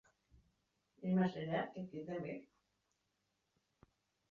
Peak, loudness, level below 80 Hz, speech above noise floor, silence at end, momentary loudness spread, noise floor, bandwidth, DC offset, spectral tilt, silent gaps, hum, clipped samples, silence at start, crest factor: -26 dBFS; -41 LUFS; -78 dBFS; 45 dB; 1.9 s; 12 LU; -85 dBFS; 6.8 kHz; under 0.1%; -6.5 dB/octave; none; none; under 0.1%; 1 s; 20 dB